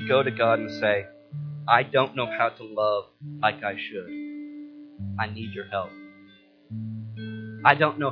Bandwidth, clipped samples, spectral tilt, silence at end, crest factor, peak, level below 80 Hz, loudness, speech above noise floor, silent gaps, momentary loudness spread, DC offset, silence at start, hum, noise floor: 5.4 kHz; under 0.1%; -7.5 dB/octave; 0 s; 26 dB; 0 dBFS; -70 dBFS; -26 LUFS; 29 dB; none; 18 LU; under 0.1%; 0 s; none; -54 dBFS